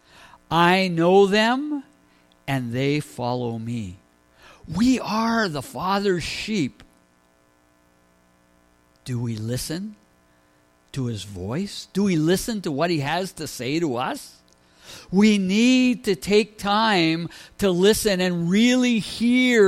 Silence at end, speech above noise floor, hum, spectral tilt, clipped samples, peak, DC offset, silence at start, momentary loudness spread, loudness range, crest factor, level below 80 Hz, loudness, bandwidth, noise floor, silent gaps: 0 s; 39 dB; none; -5 dB/octave; under 0.1%; -6 dBFS; under 0.1%; 0.5 s; 13 LU; 12 LU; 18 dB; -52 dBFS; -22 LUFS; 15.5 kHz; -60 dBFS; none